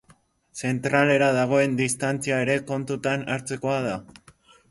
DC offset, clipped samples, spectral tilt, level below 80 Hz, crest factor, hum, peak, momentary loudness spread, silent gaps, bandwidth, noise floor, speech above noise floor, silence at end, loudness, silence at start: under 0.1%; under 0.1%; -5 dB/octave; -62 dBFS; 18 dB; none; -6 dBFS; 10 LU; none; 11.5 kHz; -59 dBFS; 36 dB; 0.7 s; -24 LUFS; 0.55 s